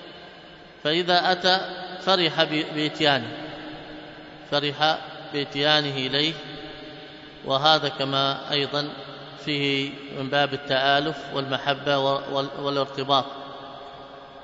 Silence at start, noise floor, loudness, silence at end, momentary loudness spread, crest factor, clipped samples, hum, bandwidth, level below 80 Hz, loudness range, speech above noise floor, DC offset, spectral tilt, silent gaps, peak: 0 s; -46 dBFS; -23 LUFS; 0 s; 20 LU; 24 dB; under 0.1%; none; 7.8 kHz; -62 dBFS; 3 LU; 22 dB; under 0.1%; -4.5 dB/octave; none; -2 dBFS